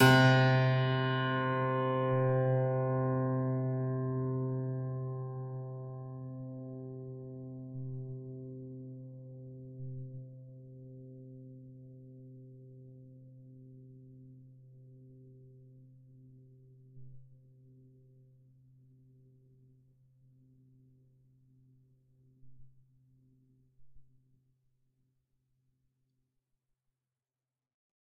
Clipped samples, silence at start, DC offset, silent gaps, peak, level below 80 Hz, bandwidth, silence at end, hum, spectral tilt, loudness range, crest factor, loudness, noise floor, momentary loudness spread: under 0.1%; 0 s; under 0.1%; none; -10 dBFS; -70 dBFS; 5.2 kHz; 4.1 s; none; -5.5 dB/octave; 26 LU; 26 dB; -33 LUFS; under -90 dBFS; 25 LU